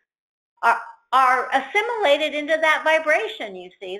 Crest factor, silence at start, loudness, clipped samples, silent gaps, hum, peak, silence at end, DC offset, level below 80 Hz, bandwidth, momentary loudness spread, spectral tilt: 16 dB; 0.6 s; -20 LUFS; under 0.1%; none; none; -4 dBFS; 0 s; under 0.1%; -72 dBFS; 14 kHz; 11 LU; -1.5 dB/octave